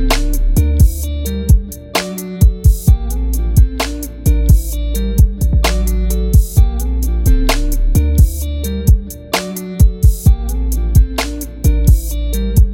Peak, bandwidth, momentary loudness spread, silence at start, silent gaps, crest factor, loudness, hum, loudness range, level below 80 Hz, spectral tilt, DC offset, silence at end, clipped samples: 0 dBFS; 17 kHz; 8 LU; 0 s; none; 12 dB; -15 LUFS; none; 1 LU; -14 dBFS; -5.5 dB/octave; 0.2%; 0 s; under 0.1%